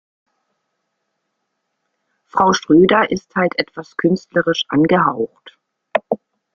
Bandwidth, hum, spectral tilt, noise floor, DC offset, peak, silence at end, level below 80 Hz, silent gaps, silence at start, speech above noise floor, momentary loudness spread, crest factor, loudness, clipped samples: 7.2 kHz; none; -5.5 dB/octave; -74 dBFS; under 0.1%; -2 dBFS; 0.4 s; -56 dBFS; none; 2.35 s; 58 dB; 13 LU; 18 dB; -17 LUFS; under 0.1%